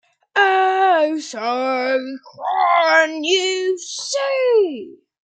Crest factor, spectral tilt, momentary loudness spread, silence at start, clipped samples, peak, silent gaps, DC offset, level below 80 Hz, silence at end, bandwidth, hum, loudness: 16 dB; -0.5 dB/octave; 9 LU; 0.35 s; under 0.1%; -2 dBFS; none; under 0.1%; -80 dBFS; 0.35 s; 9.4 kHz; none; -18 LUFS